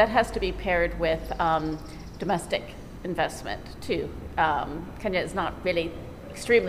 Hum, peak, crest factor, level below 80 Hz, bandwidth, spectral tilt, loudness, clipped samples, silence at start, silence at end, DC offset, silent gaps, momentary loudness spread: none; -8 dBFS; 18 dB; -42 dBFS; 15.5 kHz; -5 dB/octave; -28 LUFS; under 0.1%; 0 s; 0 s; 0.2%; none; 12 LU